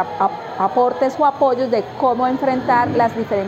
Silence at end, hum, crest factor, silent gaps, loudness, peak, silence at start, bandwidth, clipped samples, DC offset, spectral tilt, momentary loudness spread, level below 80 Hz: 0 s; none; 12 dB; none; -18 LUFS; -6 dBFS; 0 s; 8.2 kHz; under 0.1%; under 0.1%; -7 dB/octave; 5 LU; -56 dBFS